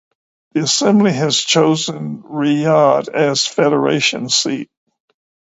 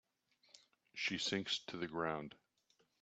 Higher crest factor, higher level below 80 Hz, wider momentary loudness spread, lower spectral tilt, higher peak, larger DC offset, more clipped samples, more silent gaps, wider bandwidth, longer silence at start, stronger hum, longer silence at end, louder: second, 16 dB vs 22 dB; first, -62 dBFS vs -78 dBFS; about the same, 11 LU vs 12 LU; about the same, -4 dB/octave vs -3 dB/octave; first, 0 dBFS vs -24 dBFS; neither; neither; neither; about the same, 8 kHz vs 8.4 kHz; about the same, 0.55 s vs 0.55 s; neither; first, 0.85 s vs 0.7 s; first, -15 LUFS vs -41 LUFS